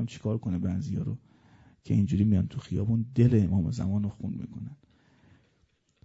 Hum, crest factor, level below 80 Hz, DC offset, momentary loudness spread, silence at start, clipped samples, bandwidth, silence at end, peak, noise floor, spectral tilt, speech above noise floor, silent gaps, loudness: none; 18 dB; -52 dBFS; under 0.1%; 14 LU; 0 s; under 0.1%; 8 kHz; 1.3 s; -10 dBFS; -70 dBFS; -9 dB/octave; 42 dB; none; -28 LUFS